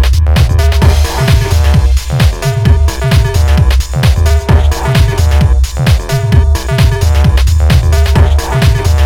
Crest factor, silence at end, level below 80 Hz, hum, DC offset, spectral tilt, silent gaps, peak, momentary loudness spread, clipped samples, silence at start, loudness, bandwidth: 8 dB; 0 s; -10 dBFS; none; under 0.1%; -5.5 dB/octave; none; 0 dBFS; 2 LU; 0.6%; 0 s; -10 LUFS; 16.5 kHz